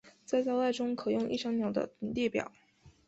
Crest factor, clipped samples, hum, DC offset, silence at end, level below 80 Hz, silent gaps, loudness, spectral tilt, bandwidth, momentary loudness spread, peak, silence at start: 16 dB; under 0.1%; none; under 0.1%; 0.2 s; -66 dBFS; none; -33 LUFS; -5.5 dB/octave; 8.2 kHz; 5 LU; -18 dBFS; 0.05 s